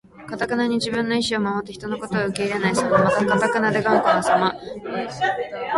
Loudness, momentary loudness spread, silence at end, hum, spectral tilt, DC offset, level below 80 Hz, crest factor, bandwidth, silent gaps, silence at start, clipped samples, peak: -21 LUFS; 11 LU; 0 s; none; -5 dB/octave; under 0.1%; -54 dBFS; 18 dB; 11.5 kHz; none; 0.15 s; under 0.1%; -4 dBFS